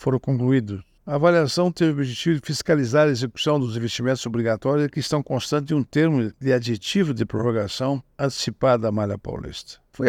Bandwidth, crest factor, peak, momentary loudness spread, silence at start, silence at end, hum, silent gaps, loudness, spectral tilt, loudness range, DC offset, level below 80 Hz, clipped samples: 15.5 kHz; 18 dB; -4 dBFS; 8 LU; 0 s; 0 s; none; none; -22 LUFS; -6 dB/octave; 2 LU; under 0.1%; -54 dBFS; under 0.1%